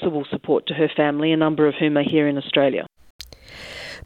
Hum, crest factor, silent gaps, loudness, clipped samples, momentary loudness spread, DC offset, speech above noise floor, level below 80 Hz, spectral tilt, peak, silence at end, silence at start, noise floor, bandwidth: none; 18 dB; 3.10-3.19 s; -20 LUFS; under 0.1%; 20 LU; under 0.1%; 21 dB; -56 dBFS; -7 dB/octave; -4 dBFS; 0.05 s; 0 s; -40 dBFS; 9.4 kHz